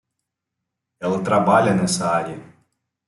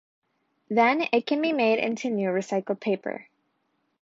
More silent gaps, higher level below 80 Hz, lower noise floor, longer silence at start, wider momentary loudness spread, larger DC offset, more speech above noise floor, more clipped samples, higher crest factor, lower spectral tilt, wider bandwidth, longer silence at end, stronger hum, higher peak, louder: neither; first, -62 dBFS vs -78 dBFS; first, -81 dBFS vs -74 dBFS; first, 1 s vs 0.7 s; first, 14 LU vs 8 LU; neither; first, 63 dB vs 49 dB; neither; about the same, 20 dB vs 18 dB; about the same, -5 dB/octave vs -5.5 dB/octave; first, 12 kHz vs 7.8 kHz; second, 0.65 s vs 0.8 s; neither; first, -2 dBFS vs -8 dBFS; first, -19 LUFS vs -25 LUFS